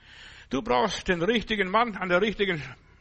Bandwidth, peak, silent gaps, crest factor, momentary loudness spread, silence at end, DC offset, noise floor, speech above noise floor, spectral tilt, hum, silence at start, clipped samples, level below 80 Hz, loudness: 8.4 kHz; -10 dBFS; none; 18 dB; 13 LU; 0.25 s; under 0.1%; -49 dBFS; 23 dB; -4.5 dB/octave; none; 0.1 s; under 0.1%; -48 dBFS; -26 LUFS